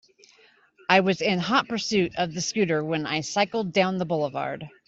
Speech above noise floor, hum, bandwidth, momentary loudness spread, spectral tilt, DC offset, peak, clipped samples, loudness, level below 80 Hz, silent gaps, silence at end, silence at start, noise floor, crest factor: 34 dB; none; 8 kHz; 6 LU; -4.5 dB/octave; under 0.1%; -4 dBFS; under 0.1%; -24 LUFS; -64 dBFS; none; 0.2 s; 0.9 s; -58 dBFS; 20 dB